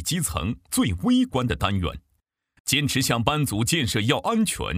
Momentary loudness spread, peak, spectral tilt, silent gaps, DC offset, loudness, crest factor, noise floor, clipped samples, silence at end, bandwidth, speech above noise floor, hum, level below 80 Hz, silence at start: 7 LU; -2 dBFS; -4 dB/octave; 2.60-2.65 s; under 0.1%; -23 LUFS; 20 dB; -73 dBFS; under 0.1%; 0 s; 16 kHz; 49 dB; none; -44 dBFS; 0 s